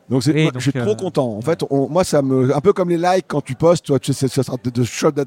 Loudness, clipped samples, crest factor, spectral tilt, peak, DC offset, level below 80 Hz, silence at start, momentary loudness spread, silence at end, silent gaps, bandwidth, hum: -18 LUFS; under 0.1%; 16 dB; -6 dB/octave; 0 dBFS; under 0.1%; -52 dBFS; 0.1 s; 5 LU; 0 s; none; 16.5 kHz; none